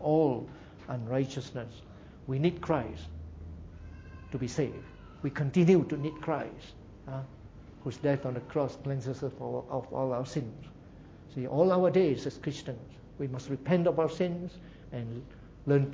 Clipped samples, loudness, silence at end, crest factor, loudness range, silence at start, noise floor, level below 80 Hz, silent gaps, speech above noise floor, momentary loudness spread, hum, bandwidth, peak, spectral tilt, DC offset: under 0.1%; -32 LUFS; 0 s; 20 dB; 5 LU; 0 s; -51 dBFS; -54 dBFS; none; 20 dB; 22 LU; none; 7.8 kHz; -12 dBFS; -8 dB/octave; under 0.1%